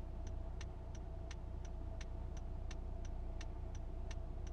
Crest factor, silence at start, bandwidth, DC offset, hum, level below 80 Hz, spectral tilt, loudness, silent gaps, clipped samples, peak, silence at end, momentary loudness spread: 12 dB; 0 s; 7.4 kHz; under 0.1%; none; -46 dBFS; -6 dB/octave; -49 LUFS; none; under 0.1%; -34 dBFS; 0 s; 1 LU